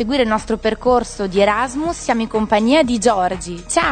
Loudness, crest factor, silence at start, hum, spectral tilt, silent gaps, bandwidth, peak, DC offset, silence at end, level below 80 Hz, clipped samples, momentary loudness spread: -17 LUFS; 16 dB; 0 s; none; -4 dB/octave; none; 9.4 kHz; -2 dBFS; under 0.1%; 0 s; -38 dBFS; under 0.1%; 7 LU